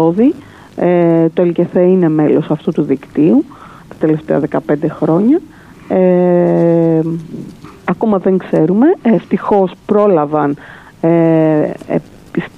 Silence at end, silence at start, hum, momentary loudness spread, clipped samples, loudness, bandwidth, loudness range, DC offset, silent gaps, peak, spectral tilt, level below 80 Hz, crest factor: 0.1 s; 0 s; none; 10 LU; under 0.1%; -13 LUFS; 6.2 kHz; 2 LU; under 0.1%; none; 0 dBFS; -10 dB/octave; -50 dBFS; 12 dB